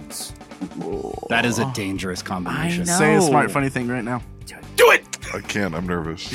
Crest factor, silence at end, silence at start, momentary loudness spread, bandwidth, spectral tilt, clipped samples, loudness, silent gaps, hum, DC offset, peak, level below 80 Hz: 20 dB; 0 s; 0 s; 16 LU; 16.5 kHz; -4.5 dB/octave; under 0.1%; -20 LUFS; none; none; under 0.1%; -2 dBFS; -46 dBFS